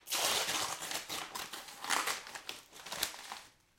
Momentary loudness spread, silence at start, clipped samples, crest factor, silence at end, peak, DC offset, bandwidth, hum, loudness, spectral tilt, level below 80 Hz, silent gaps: 15 LU; 0.05 s; under 0.1%; 26 dB; 0.3 s; -12 dBFS; under 0.1%; 17 kHz; none; -36 LUFS; 0.5 dB/octave; -72 dBFS; none